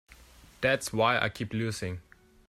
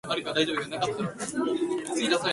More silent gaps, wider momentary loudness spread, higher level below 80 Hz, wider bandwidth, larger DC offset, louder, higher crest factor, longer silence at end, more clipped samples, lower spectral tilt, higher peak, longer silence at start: neither; first, 12 LU vs 4 LU; first, -58 dBFS vs -66 dBFS; first, 15.5 kHz vs 11.5 kHz; neither; about the same, -29 LUFS vs -28 LUFS; about the same, 20 dB vs 20 dB; first, 0.45 s vs 0 s; neither; about the same, -4.5 dB/octave vs -3.5 dB/octave; about the same, -12 dBFS vs -10 dBFS; about the same, 0.1 s vs 0.05 s